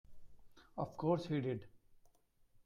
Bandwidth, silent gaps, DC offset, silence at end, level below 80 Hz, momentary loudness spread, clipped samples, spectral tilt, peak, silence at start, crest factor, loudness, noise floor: 11.5 kHz; none; under 0.1%; 0.65 s; -68 dBFS; 10 LU; under 0.1%; -8.5 dB/octave; -22 dBFS; 0.1 s; 22 dB; -40 LUFS; -71 dBFS